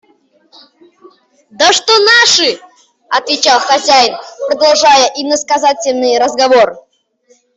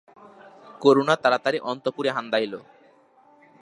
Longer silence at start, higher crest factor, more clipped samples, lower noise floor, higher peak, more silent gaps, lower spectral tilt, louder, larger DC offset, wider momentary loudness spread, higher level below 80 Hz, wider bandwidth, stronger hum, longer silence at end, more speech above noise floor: first, 1.6 s vs 0.65 s; second, 12 dB vs 22 dB; neither; second, -52 dBFS vs -57 dBFS; first, 0 dBFS vs -4 dBFS; neither; second, 0 dB/octave vs -5 dB/octave; first, -9 LUFS vs -23 LUFS; neither; about the same, 9 LU vs 10 LU; first, -58 dBFS vs -78 dBFS; second, 8.4 kHz vs 11 kHz; neither; second, 0.8 s vs 1 s; first, 43 dB vs 34 dB